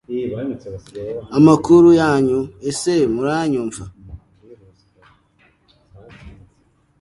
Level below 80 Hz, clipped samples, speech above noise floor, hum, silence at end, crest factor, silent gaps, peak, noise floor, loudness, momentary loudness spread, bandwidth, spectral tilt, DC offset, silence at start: -48 dBFS; under 0.1%; 43 dB; none; 0.7 s; 18 dB; none; 0 dBFS; -59 dBFS; -16 LUFS; 21 LU; 11.5 kHz; -6.5 dB/octave; under 0.1%; 0.1 s